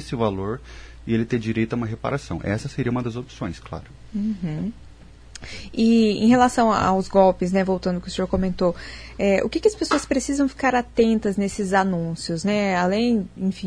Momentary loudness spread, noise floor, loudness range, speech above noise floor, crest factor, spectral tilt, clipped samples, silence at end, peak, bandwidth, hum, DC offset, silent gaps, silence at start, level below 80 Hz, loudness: 15 LU; -44 dBFS; 8 LU; 22 dB; 18 dB; -6 dB/octave; under 0.1%; 0 s; -4 dBFS; 10.5 kHz; none; under 0.1%; none; 0 s; -42 dBFS; -22 LUFS